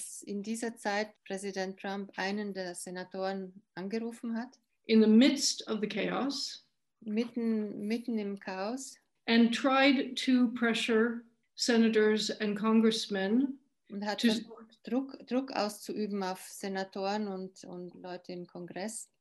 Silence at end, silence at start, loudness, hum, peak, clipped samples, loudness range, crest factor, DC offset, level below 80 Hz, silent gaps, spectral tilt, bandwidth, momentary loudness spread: 0.15 s; 0 s; -31 LUFS; none; -12 dBFS; under 0.1%; 9 LU; 20 dB; under 0.1%; -80 dBFS; none; -4 dB/octave; 12.5 kHz; 18 LU